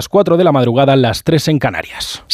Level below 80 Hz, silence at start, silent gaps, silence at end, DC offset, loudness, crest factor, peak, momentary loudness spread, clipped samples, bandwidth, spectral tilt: -42 dBFS; 0 s; none; 0 s; under 0.1%; -13 LUFS; 12 dB; -2 dBFS; 10 LU; under 0.1%; 16 kHz; -6 dB/octave